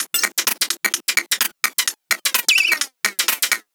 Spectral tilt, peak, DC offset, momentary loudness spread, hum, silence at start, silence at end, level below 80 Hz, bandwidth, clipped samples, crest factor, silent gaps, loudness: 3 dB/octave; 0 dBFS; under 0.1%; 6 LU; none; 0 s; 0.15 s; -84 dBFS; over 20 kHz; under 0.1%; 20 dB; none; -18 LUFS